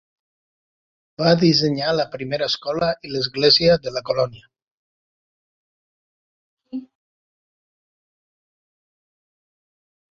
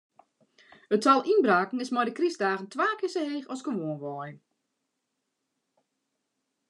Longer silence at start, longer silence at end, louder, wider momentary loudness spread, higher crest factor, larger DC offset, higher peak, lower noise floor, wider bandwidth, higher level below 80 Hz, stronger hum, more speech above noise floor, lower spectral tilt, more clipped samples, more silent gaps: first, 1.2 s vs 0.9 s; first, 3.25 s vs 2.35 s; first, -19 LUFS vs -27 LUFS; about the same, 14 LU vs 13 LU; about the same, 22 dB vs 22 dB; neither; first, -2 dBFS vs -8 dBFS; first, under -90 dBFS vs -82 dBFS; second, 7.4 kHz vs 11 kHz; first, -56 dBFS vs under -90 dBFS; neither; first, over 71 dB vs 55 dB; about the same, -5.5 dB/octave vs -5 dB/octave; neither; first, 4.62-6.57 s vs none